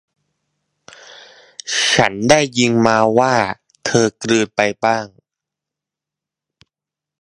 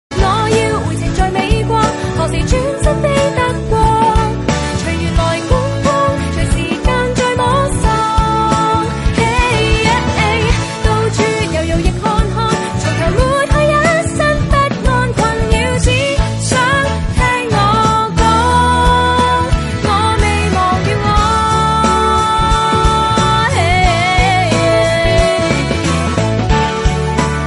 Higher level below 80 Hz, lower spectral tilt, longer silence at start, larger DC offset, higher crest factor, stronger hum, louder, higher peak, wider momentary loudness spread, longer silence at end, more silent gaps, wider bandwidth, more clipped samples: second, -54 dBFS vs -20 dBFS; second, -3.5 dB/octave vs -5 dB/octave; first, 1.1 s vs 0.1 s; neither; first, 18 dB vs 12 dB; neither; about the same, -15 LUFS vs -13 LUFS; about the same, 0 dBFS vs 0 dBFS; first, 10 LU vs 4 LU; first, 2.15 s vs 0 s; neither; about the same, 11.5 kHz vs 11.5 kHz; neither